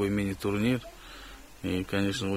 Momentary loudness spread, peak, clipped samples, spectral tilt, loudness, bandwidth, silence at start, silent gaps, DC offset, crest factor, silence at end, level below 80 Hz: 17 LU; -14 dBFS; under 0.1%; -6 dB/octave; -30 LUFS; 16 kHz; 0 s; none; under 0.1%; 16 dB; 0 s; -50 dBFS